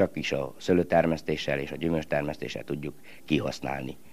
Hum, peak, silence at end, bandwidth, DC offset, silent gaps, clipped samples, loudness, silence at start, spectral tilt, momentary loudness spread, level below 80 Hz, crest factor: none; -8 dBFS; 0.15 s; 15.5 kHz; 0.5%; none; under 0.1%; -29 LUFS; 0 s; -6 dB/octave; 11 LU; -52 dBFS; 20 dB